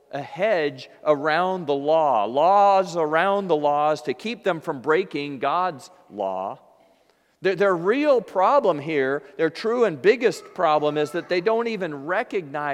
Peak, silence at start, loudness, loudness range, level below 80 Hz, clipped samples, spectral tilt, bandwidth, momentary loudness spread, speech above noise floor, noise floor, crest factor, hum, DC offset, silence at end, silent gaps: -4 dBFS; 0.15 s; -22 LUFS; 5 LU; -74 dBFS; under 0.1%; -5.5 dB/octave; 12.5 kHz; 10 LU; 40 dB; -62 dBFS; 18 dB; none; under 0.1%; 0 s; none